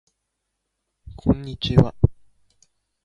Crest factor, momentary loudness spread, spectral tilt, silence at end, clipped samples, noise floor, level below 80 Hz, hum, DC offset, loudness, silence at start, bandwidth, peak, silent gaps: 24 dB; 6 LU; -8.5 dB/octave; 0.9 s; under 0.1%; -78 dBFS; -34 dBFS; none; under 0.1%; -22 LUFS; 1.25 s; 7.4 kHz; 0 dBFS; none